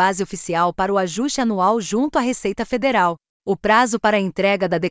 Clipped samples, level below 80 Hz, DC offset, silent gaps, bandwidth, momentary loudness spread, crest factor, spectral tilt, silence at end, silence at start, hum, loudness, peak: under 0.1%; -50 dBFS; under 0.1%; 3.29-3.40 s; 8 kHz; 7 LU; 16 dB; -4.5 dB/octave; 0 s; 0 s; none; -19 LUFS; -4 dBFS